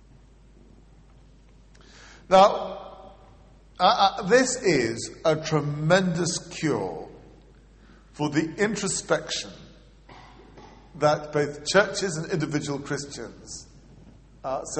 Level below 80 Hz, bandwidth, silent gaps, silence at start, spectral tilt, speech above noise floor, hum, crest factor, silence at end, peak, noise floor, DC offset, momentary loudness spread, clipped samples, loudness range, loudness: -54 dBFS; 8.8 kHz; none; 1.95 s; -4 dB/octave; 29 dB; none; 22 dB; 0 s; -4 dBFS; -53 dBFS; under 0.1%; 19 LU; under 0.1%; 7 LU; -24 LUFS